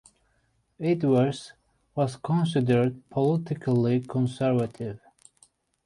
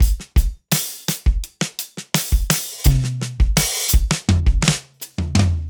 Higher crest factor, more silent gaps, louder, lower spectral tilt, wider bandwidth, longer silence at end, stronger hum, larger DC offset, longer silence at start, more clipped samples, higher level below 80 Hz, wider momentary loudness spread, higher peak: about the same, 16 dB vs 18 dB; neither; second, -26 LUFS vs -20 LUFS; first, -8 dB/octave vs -4 dB/octave; second, 11.5 kHz vs over 20 kHz; first, 0.9 s vs 0 s; neither; neither; first, 0.8 s vs 0 s; neither; second, -62 dBFS vs -20 dBFS; first, 14 LU vs 8 LU; second, -10 dBFS vs 0 dBFS